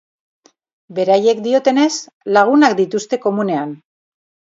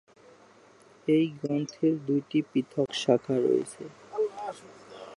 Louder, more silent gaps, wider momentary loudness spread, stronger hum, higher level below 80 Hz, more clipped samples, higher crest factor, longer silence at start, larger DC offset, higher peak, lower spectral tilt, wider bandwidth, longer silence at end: first, -15 LUFS vs -28 LUFS; first, 2.13-2.21 s vs none; second, 10 LU vs 14 LU; neither; first, -68 dBFS vs -76 dBFS; neither; about the same, 16 dB vs 20 dB; second, 0.9 s vs 1.05 s; neither; first, 0 dBFS vs -8 dBFS; second, -4.5 dB/octave vs -6 dB/octave; second, 7.8 kHz vs 11.5 kHz; first, 0.85 s vs 0 s